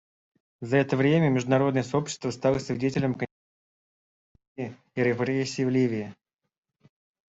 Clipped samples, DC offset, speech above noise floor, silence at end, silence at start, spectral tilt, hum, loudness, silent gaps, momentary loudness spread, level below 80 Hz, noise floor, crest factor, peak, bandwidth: under 0.1%; under 0.1%; over 65 dB; 1.15 s; 0.6 s; -6.5 dB/octave; none; -26 LUFS; 3.31-4.35 s, 4.47-4.55 s; 15 LU; -62 dBFS; under -90 dBFS; 18 dB; -8 dBFS; 8 kHz